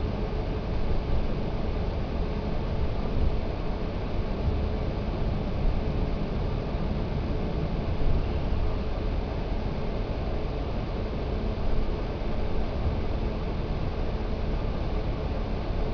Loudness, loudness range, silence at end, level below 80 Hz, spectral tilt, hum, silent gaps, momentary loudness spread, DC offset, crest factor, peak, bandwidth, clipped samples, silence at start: -31 LUFS; 1 LU; 0 s; -30 dBFS; -8.5 dB/octave; none; none; 3 LU; under 0.1%; 14 dB; -12 dBFS; 5.4 kHz; under 0.1%; 0 s